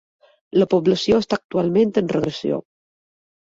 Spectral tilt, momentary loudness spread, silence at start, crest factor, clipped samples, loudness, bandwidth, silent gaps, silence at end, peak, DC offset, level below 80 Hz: -6.5 dB/octave; 7 LU; 0.55 s; 16 dB; under 0.1%; -20 LUFS; 7.8 kHz; 1.44-1.49 s; 0.8 s; -4 dBFS; under 0.1%; -52 dBFS